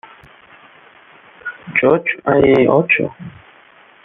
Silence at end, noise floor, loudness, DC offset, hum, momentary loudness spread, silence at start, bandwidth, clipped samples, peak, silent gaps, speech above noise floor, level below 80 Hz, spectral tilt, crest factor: 0.75 s; -47 dBFS; -14 LUFS; under 0.1%; none; 20 LU; 1.45 s; 4.3 kHz; under 0.1%; -2 dBFS; none; 33 dB; -50 dBFS; -9 dB/octave; 16 dB